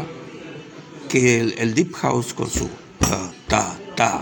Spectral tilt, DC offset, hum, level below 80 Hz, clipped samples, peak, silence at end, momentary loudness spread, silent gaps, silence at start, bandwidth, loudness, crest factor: -4.5 dB/octave; under 0.1%; none; -40 dBFS; under 0.1%; -2 dBFS; 0 s; 19 LU; none; 0 s; 17 kHz; -21 LUFS; 20 dB